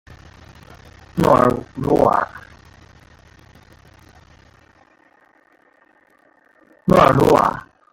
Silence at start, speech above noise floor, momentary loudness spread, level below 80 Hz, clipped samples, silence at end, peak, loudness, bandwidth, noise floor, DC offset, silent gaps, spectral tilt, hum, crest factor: 1.15 s; 41 dB; 16 LU; -44 dBFS; under 0.1%; 0.3 s; 0 dBFS; -16 LUFS; 17 kHz; -56 dBFS; under 0.1%; none; -7 dB/octave; none; 20 dB